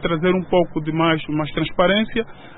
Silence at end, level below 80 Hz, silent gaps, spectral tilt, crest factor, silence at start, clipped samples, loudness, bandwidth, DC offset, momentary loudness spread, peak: 0 s; -40 dBFS; none; -11.5 dB/octave; 18 dB; 0 s; under 0.1%; -20 LUFS; 4.1 kHz; under 0.1%; 6 LU; -2 dBFS